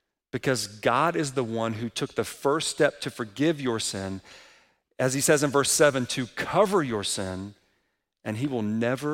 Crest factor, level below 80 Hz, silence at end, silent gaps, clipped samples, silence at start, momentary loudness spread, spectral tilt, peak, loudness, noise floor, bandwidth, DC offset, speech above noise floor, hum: 20 dB; -62 dBFS; 0 s; none; under 0.1%; 0.35 s; 12 LU; -4 dB/octave; -8 dBFS; -26 LUFS; -75 dBFS; 16.5 kHz; under 0.1%; 49 dB; none